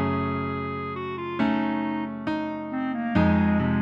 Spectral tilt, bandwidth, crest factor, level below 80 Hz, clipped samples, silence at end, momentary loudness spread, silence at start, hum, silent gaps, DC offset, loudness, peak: -9 dB/octave; 5.6 kHz; 18 dB; -46 dBFS; under 0.1%; 0 s; 9 LU; 0 s; none; none; under 0.1%; -26 LUFS; -8 dBFS